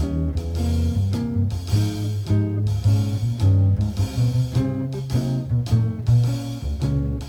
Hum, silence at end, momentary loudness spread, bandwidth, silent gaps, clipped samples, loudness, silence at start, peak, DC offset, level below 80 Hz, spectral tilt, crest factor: none; 0 s; 6 LU; 15.5 kHz; none; under 0.1%; -22 LUFS; 0 s; -8 dBFS; under 0.1%; -34 dBFS; -7.5 dB/octave; 12 dB